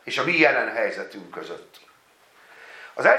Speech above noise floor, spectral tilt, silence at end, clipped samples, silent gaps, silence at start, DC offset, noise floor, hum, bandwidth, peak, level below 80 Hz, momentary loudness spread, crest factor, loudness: 33 dB; -4.5 dB/octave; 0 s; under 0.1%; none; 0.05 s; under 0.1%; -57 dBFS; none; 14 kHz; -2 dBFS; -80 dBFS; 23 LU; 22 dB; -21 LUFS